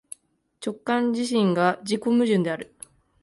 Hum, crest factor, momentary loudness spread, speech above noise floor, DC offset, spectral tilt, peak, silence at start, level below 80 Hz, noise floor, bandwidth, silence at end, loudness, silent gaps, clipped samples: none; 16 dB; 17 LU; 34 dB; under 0.1%; -5.5 dB/octave; -8 dBFS; 0.6 s; -68 dBFS; -56 dBFS; 11.5 kHz; 0.6 s; -24 LUFS; none; under 0.1%